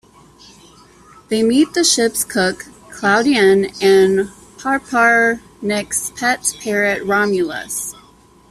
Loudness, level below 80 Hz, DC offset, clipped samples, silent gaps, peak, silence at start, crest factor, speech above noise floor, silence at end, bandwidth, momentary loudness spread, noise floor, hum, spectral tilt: -16 LUFS; -52 dBFS; under 0.1%; under 0.1%; none; -2 dBFS; 1.3 s; 16 dB; 32 dB; 0.6 s; 14.5 kHz; 11 LU; -48 dBFS; none; -3 dB/octave